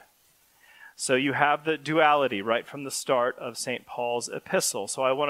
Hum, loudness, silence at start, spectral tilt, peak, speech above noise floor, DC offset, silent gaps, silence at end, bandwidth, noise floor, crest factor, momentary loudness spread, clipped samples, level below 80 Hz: none; -26 LUFS; 0.8 s; -3 dB/octave; -4 dBFS; 37 dB; under 0.1%; none; 0 s; 16 kHz; -63 dBFS; 22 dB; 10 LU; under 0.1%; -76 dBFS